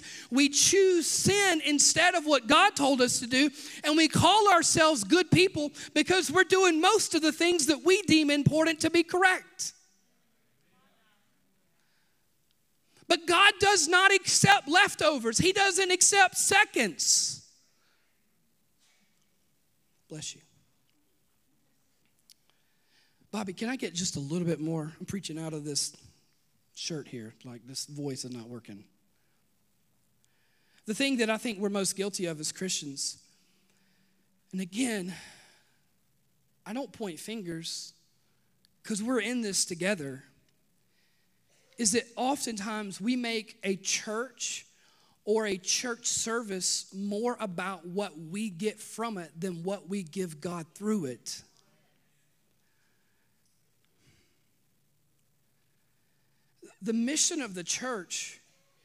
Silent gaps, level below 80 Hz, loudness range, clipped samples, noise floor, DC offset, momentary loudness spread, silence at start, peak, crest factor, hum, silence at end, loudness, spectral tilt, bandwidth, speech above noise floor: none; -66 dBFS; 19 LU; under 0.1%; -73 dBFS; under 0.1%; 17 LU; 0 s; -4 dBFS; 24 dB; none; 0.5 s; -26 LUFS; -2.5 dB/octave; 15.5 kHz; 46 dB